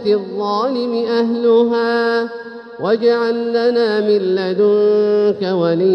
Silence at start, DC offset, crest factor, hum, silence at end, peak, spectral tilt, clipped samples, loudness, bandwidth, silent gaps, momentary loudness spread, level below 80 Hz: 0 s; under 0.1%; 12 dB; none; 0 s; -4 dBFS; -7 dB/octave; under 0.1%; -16 LUFS; 6.2 kHz; none; 6 LU; -66 dBFS